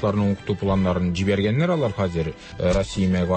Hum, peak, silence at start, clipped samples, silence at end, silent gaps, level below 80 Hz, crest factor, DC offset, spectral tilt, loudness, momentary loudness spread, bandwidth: none; -10 dBFS; 0 s; under 0.1%; 0 s; none; -38 dBFS; 12 dB; under 0.1%; -7 dB/octave; -23 LUFS; 4 LU; 8.8 kHz